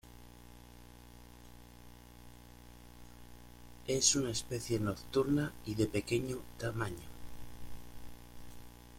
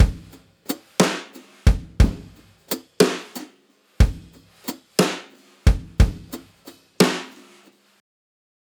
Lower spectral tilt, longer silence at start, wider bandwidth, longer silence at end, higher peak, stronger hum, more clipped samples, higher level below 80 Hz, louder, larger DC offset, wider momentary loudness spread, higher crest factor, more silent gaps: about the same, -4 dB/octave vs -5 dB/octave; about the same, 0.05 s vs 0 s; second, 16.5 kHz vs over 20 kHz; second, 0 s vs 1.45 s; second, -14 dBFS vs -2 dBFS; first, 60 Hz at -55 dBFS vs none; neither; second, -56 dBFS vs -26 dBFS; second, -34 LUFS vs -22 LUFS; neither; first, 24 LU vs 19 LU; about the same, 24 dB vs 20 dB; neither